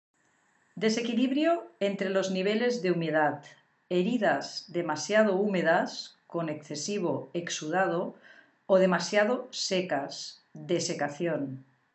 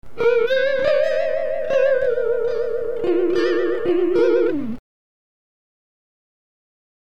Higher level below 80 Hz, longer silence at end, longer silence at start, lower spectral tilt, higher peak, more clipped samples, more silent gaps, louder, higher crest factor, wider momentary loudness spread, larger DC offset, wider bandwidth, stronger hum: second, under -90 dBFS vs -56 dBFS; second, 0.3 s vs 2.25 s; first, 0.75 s vs 0 s; second, -4.5 dB/octave vs -6 dB/octave; second, -10 dBFS vs -6 dBFS; neither; neither; second, -29 LUFS vs -19 LUFS; first, 20 dB vs 14 dB; first, 10 LU vs 6 LU; second, under 0.1% vs 4%; first, 8.4 kHz vs 7.6 kHz; neither